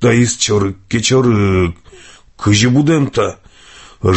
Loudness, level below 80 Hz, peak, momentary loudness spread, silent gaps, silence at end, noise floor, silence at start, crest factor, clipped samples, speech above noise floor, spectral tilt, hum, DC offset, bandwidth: -14 LUFS; -34 dBFS; 0 dBFS; 8 LU; none; 0 s; -41 dBFS; 0 s; 14 dB; under 0.1%; 28 dB; -5 dB/octave; none; under 0.1%; 8.6 kHz